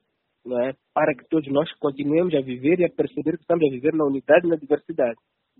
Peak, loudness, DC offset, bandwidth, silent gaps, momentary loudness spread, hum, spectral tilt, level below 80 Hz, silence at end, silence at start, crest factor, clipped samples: -4 dBFS; -23 LUFS; under 0.1%; 4.1 kHz; none; 8 LU; none; -5.5 dB/octave; -66 dBFS; 0.45 s; 0.45 s; 20 dB; under 0.1%